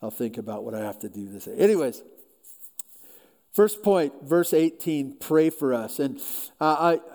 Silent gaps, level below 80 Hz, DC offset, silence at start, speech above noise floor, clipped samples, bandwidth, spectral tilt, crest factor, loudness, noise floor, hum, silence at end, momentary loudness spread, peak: none; -74 dBFS; under 0.1%; 0 s; 29 dB; under 0.1%; over 20 kHz; -5.5 dB/octave; 18 dB; -25 LUFS; -53 dBFS; none; 0 s; 17 LU; -8 dBFS